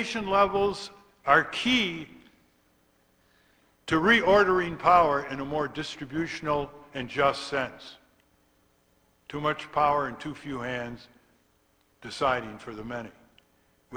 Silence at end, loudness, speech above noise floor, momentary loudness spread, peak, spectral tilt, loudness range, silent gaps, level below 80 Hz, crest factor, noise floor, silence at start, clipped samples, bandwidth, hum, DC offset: 0 s; -26 LUFS; 41 dB; 19 LU; -6 dBFS; -4.5 dB/octave; 8 LU; none; -56 dBFS; 24 dB; -67 dBFS; 0 s; under 0.1%; over 20 kHz; none; under 0.1%